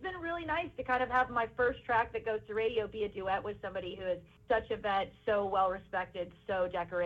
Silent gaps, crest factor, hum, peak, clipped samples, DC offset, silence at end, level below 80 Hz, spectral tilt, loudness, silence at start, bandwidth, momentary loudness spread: none; 16 dB; none; -18 dBFS; under 0.1%; under 0.1%; 0 s; -58 dBFS; -6.5 dB/octave; -34 LUFS; 0 s; 7.6 kHz; 8 LU